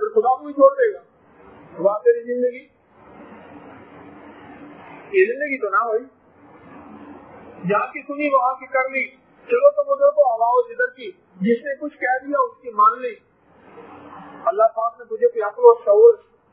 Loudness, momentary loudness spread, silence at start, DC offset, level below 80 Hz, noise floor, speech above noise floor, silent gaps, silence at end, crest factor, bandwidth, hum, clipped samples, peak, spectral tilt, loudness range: -19 LUFS; 15 LU; 0 s; under 0.1%; -70 dBFS; -50 dBFS; 31 dB; none; 0.35 s; 20 dB; 3.9 kHz; none; under 0.1%; 0 dBFS; -10 dB/octave; 6 LU